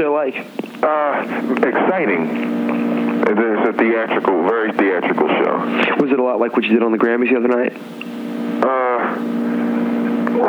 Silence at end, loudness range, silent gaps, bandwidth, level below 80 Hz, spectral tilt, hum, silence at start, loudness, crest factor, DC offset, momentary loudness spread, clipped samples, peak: 0 s; 2 LU; none; 7.6 kHz; -70 dBFS; -7 dB/octave; none; 0 s; -17 LUFS; 16 dB; under 0.1%; 5 LU; under 0.1%; -2 dBFS